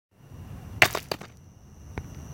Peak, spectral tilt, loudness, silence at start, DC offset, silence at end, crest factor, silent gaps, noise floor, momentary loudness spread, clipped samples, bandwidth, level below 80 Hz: 0 dBFS; -2.5 dB/octave; -24 LUFS; 0.25 s; under 0.1%; 0 s; 30 dB; none; -50 dBFS; 24 LU; under 0.1%; 17 kHz; -48 dBFS